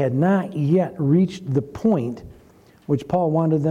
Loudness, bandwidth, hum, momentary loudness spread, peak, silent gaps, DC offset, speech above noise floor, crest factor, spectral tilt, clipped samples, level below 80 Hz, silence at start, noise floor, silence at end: -21 LUFS; 9.8 kHz; none; 7 LU; -8 dBFS; none; under 0.1%; 31 dB; 12 dB; -9 dB/octave; under 0.1%; -54 dBFS; 0 s; -51 dBFS; 0 s